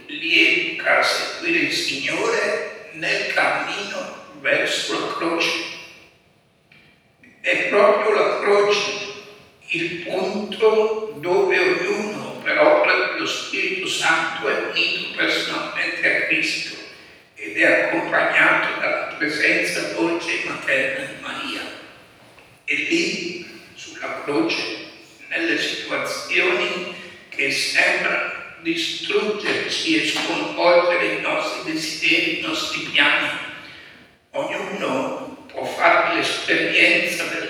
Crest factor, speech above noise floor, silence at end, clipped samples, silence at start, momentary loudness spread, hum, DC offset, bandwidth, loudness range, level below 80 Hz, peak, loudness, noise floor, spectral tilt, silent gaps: 20 dB; 37 dB; 0 s; under 0.1%; 0 s; 13 LU; none; under 0.1%; 19.5 kHz; 5 LU; -68 dBFS; -2 dBFS; -20 LUFS; -58 dBFS; -2.5 dB/octave; none